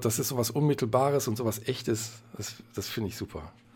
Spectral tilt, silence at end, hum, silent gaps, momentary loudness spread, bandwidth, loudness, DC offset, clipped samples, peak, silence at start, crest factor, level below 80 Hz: -5 dB/octave; 0.25 s; none; none; 14 LU; 17.5 kHz; -30 LUFS; under 0.1%; under 0.1%; -10 dBFS; 0 s; 20 dB; -58 dBFS